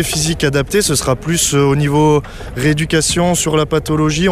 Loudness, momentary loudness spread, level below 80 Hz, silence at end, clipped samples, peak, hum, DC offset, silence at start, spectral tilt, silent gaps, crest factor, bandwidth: -14 LUFS; 4 LU; -32 dBFS; 0 s; under 0.1%; -2 dBFS; none; under 0.1%; 0 s; -4.5 dB/octave; none; 12 dB; 16 kHz